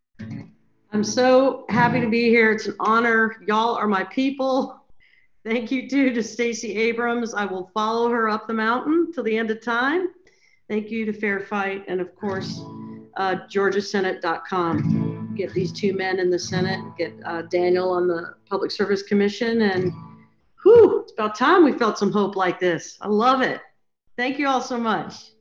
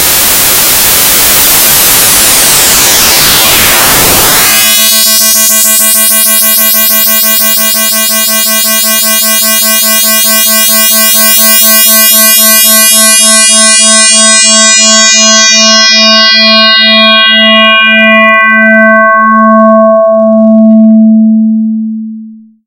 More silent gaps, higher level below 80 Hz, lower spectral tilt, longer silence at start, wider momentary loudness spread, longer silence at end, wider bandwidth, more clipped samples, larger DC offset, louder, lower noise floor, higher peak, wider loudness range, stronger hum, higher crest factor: neither; second, -66 dBFS vs -34 dBFS; first, -5.5 dB/octave vs -1 dB/octave; first, 0.2 s vs 0 s; first, 12 LU vs 4 LU; about the same, 0.2 s vs 0.3 s; second, 7.6 kHz vs over 20 kHz; second, under 0.1% vs 8%; neither; second, -22 LUFS vs -2 LUFS; first, -59 dBFS vs -26 dBFS; second, -4 dBFS vs 0 dBFS; first, 7 LU vs 3 LU; neither; first, 18 dB vs 4 dB